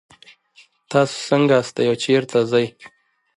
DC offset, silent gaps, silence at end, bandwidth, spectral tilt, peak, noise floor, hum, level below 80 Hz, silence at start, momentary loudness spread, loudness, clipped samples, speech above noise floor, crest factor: under 0.1%; none; 0.5 s; 11.5 kHz; -5.5 dB/octave; -2 dBFS; -54 dBFS; none; -66 dBFS; 0.9 s; 5 LU; -19 LUFS; under 0.1%; 36 dB; 18 dB